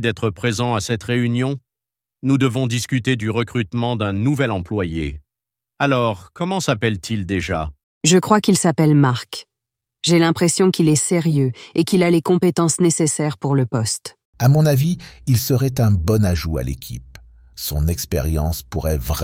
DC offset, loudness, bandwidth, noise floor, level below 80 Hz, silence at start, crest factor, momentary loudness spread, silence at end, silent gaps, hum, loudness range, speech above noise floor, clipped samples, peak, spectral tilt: under 0.1%; -19 LUFS; 17 kHz; -87 dBFS; -36 dBFS; 0 s; 18 dB; 10 LU; 0 s; 7.83-8.01 s, 14.25-14.33 s; none; 5 LU; 69 dB; under 0.1%; -2 dBFS; -5.5 dB/octave